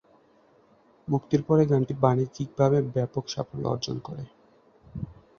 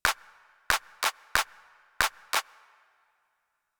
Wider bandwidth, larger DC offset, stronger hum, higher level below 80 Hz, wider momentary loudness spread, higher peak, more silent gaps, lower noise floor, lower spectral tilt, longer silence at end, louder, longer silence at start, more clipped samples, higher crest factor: second, 7 kHz vs over 20 kHz; neither; neither; about the same, -56 dBFS vs -54 dBFS; first, 18 LU vs 11 LU; about the same, -6 dBFS vs -4 dBFS; neither; second, -60 dBFS vs -78 dBFS; first, -7.5 dB/octave vs 0.5 dB/octave; second, 0.25 s vs 1.4 s; first, -26 LUFS vs -29 LUFS; first, 1.05 s vs 0.05 s; neither; second, 22 dB vs 28 dB